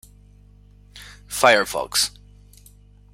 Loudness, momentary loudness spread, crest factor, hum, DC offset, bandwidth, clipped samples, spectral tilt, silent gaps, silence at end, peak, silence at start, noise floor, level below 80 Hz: -19 LUFS; 26 LU; 24 dB; 50 Hz at -45 dBFS; under 0.1%; 16 kHz; under 0.1%; -1 dB/octave; none; 1.05 s; 0 dBFS; 0.95 s; -49 dBFS; -50 dBFS